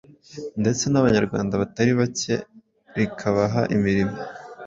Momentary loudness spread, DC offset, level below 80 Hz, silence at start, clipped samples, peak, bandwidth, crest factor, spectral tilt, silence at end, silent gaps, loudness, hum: 14 LU; under 0.1%; -50 dBFS; 0.3 s; under 0.1%; -4 dBFS; 7.8 kHz; 18 dB; -5.5 dB/octave; 0 s; none; -22 LUFS; none